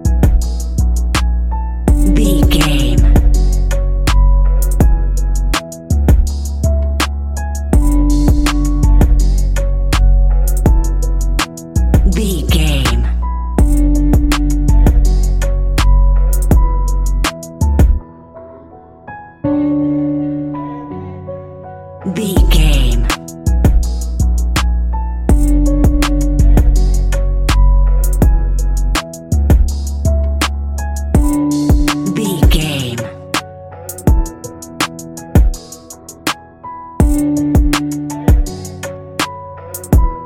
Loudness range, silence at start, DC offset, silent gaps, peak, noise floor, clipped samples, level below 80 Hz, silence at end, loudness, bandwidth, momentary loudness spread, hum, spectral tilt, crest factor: 4 LU; 0 s; under 0.1%; none; 0 dBFS; -37 dBFS; under 0.1%; -14 dBFS; 0 s; -15 LUFS; 16 kHz; 12 LU; none; -5.5 dB/octave; 12 dB